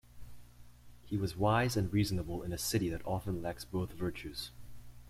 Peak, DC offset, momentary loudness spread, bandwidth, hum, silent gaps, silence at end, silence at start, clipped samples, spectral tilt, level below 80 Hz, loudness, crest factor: -16 dBFS; under 0.1%; 10 LU; 16 kHz; 60 Hz at -50 dBFS; none; 0 s; 0.1 s; under 0.1%; -5.5 dB/octave; -52 dBFS; -35 LUFS; 20 dB